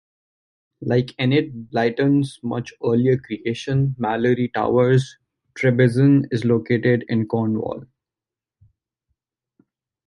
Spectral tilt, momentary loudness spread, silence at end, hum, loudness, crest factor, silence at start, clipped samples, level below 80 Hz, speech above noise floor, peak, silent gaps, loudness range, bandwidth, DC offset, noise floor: -8 dB/octave; 10 LU; 2.2 s; none; -20 LUFS; 16 dB; 0.8 s; under 0.1%; -56 dBFS; 70 dB; -4 dBFS; none; 5 LU; 11 kHz; under 0.1%; -89 dBFS